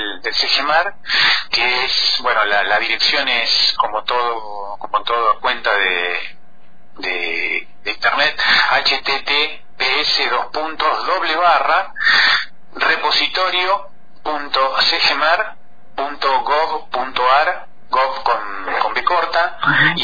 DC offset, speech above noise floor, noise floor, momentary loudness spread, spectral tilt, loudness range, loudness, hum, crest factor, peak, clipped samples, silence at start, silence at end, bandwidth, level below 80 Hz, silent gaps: 4%; 35 dB; -52 dBFS; 9 LU; -2 dB/octave; 4 LU; -16 LUFS; none; 16 dB; -2 dBFS; under 0.1%; 0 s; 0 s; 5 kHz; -50 dBFS; none